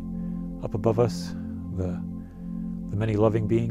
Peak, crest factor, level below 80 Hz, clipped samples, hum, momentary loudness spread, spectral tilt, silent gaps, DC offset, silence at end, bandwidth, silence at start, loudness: -8 dBFS; 18 dB; -44 dBFS; under 0.1%; none; 12 LU; -8 dB/octave; none; under 0.1%; 0 s; 12 kHz; 0 s; -28 LUFS